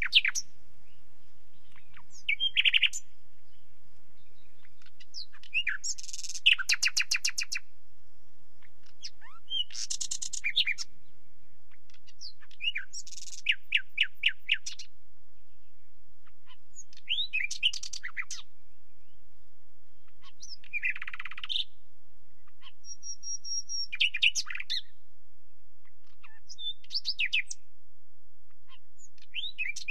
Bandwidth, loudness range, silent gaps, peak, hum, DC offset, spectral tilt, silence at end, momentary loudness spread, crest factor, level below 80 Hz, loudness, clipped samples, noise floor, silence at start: 16 kHz; 8 LU; none; -8 dBFS; none; 3%; 2.5 dB/octave; 0.05 s; 21 LU; 28 dB; -70 dBFS; -30 LUFS; under 0.1%; -69 dBFS; 0 s